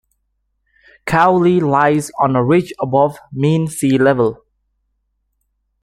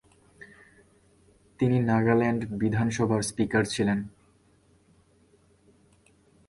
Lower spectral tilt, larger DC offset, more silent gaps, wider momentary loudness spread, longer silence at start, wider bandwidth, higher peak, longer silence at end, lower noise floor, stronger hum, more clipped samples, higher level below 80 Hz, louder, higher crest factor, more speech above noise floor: about the same, -6.5 dB/octave vs -6 dB/octave; neither; neither; about the same, 6 LU vs 5 LU; first, 1.05 s vs 0.4 s; first, 13.5 kHz vs 11.5 kHz; first, 0 dBFS vs -10 dBFS; second, 1.5 s vs 2.4 s; first, -68 dBFS vs -62 dBFS; first, 50 Hz at -45 dBFS vs none; neither; first, -50 dBFS vs -56 dBFS; first, -15 LUFS vs -26 LUFS; about the same, 16 dB vs 20 dB; first, 54 dB vs 38 dB